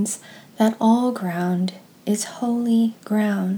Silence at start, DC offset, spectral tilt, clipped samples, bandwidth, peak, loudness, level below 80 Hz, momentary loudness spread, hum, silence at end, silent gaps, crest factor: 0 s; under 0.1%; -5.5 dB/octave; under 0.1%; 19.5 kHz; -6 dBFS; -22 LUFS; -78 dBFS; 8 LU; none; 0 s; none; 16 dB